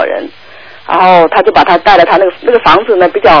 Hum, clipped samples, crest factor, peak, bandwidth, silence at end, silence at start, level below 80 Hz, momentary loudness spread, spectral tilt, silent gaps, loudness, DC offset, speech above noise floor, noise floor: none; 4%; 8 dB; 0 dBFS; 5.4 kHz; 0 s; 0 s; -36 dBFS; 9 LU; -6 dB/octave; none; -7 LUFS; under 0.1%; 28 dB; -34 dBFS